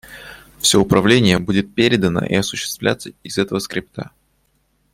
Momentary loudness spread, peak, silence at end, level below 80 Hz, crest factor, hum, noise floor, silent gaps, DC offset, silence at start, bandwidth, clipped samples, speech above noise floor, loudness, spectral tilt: 20 LU; -2 dBFS; 0.9 s; -46 dBFS; 18 dB; none; -63 dBFS; none; under 0.1%; 0.1 s; 16.5 kHz; under 0.1%; 46 dB; -17 LUFS; -4.5 dB/octave